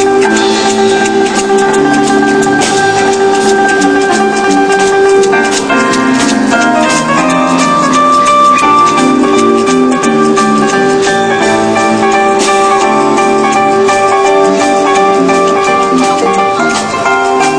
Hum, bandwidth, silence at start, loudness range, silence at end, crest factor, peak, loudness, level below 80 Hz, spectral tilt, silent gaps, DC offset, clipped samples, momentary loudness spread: none; 10.5 kHz; 0 s; 1 LU; 0 s; 8 dB; 0 dBFS; -8 LUFS; -42 dBFS; -3.5 dB/octave; none; under 0.1%; 0.3%; 3 LU